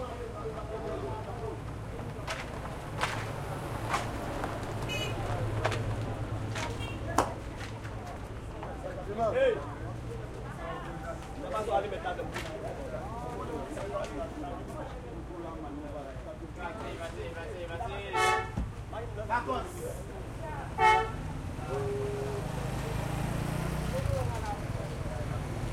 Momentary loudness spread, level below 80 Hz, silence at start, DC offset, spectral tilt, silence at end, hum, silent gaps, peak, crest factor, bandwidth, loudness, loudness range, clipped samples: 10 LU; -44 dBFS; 0 s; under 0.1%; -5.5 dB/octave; 0 s; none; none; -8 dBFS; 26 dB; 16 kHz; -35 LUFS; 7 LU; under 0.1%